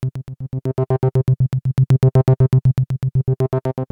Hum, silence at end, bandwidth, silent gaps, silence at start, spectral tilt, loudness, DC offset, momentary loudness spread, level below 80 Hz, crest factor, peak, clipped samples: none; 0.05 s; 4.1 kHz; none; 0 s; -10 dB/octave; -18 LUFS; under 0.1%; 11 LU; -40 dBFS; 10 dB; -6 dBFS; under 0.1%